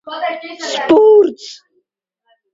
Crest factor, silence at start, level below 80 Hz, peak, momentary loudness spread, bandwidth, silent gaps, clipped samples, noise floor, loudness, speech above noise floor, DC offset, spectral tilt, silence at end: 14 dB; 0.05 s; -62 dBFS; 0 dBFS; 21 LU; 7.8 kHz; none; under 0.1%; -70 dBFS; -13 LUFS; 54 dB; under 0.1%; -3.5 dB/octave; 1 s